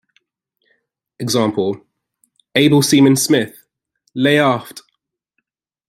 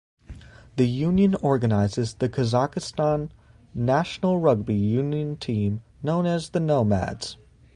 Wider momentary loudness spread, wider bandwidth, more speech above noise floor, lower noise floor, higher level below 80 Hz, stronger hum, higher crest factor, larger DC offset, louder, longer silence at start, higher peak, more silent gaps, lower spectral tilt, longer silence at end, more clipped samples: first, 16 LU vs 8 LU; first, 16 kHz vs 11 kHz; first, 59 dB vs 21 dB; first, -73 dBFS vs -44 dBFS; second, -60 dBFS vs -48 dBFS; neither; about the same, 18 dB vs 18 dB; neither; first, -15 LUFS vs -24 LUFS; first, 1.2 s vs 0.3 s; first, 0 dBFS vs -6 dBFS; neither; second, -4.5 dB/octave vs -7.5 dB/octave; first, 1.1 s vs 0.4 s; neither